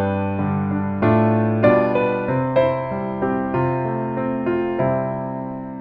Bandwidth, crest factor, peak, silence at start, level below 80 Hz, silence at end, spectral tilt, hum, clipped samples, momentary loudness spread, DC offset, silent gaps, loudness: 5.2 kHz; 16 dB; -4 dBFS; 0 s; -50 dBFS; 0 s; -11 dB/octave; none; under 0.1%; 8 LU; under 0.1%; none; -20 LUFS